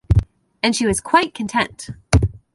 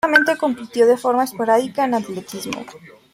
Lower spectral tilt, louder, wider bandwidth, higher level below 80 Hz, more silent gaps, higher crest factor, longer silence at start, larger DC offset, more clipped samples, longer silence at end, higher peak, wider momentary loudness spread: about the same, -5 dB/octave vs -4 dB/octave; about the same, -19 LUFS vs -19 LUFS; second, 11.5 kHz vs 16 kHz; first, -28 dBFS vs -64 dBFS; neither; about the same, 18 dB vs 18 dB; about the same, 0.1 s vs 0.05 s; neither; neither; about the same, 0.2 s vs 0.25 s; about the same, 0 dBFS vs -2 dBFS; second, 5 LU vs 14 LU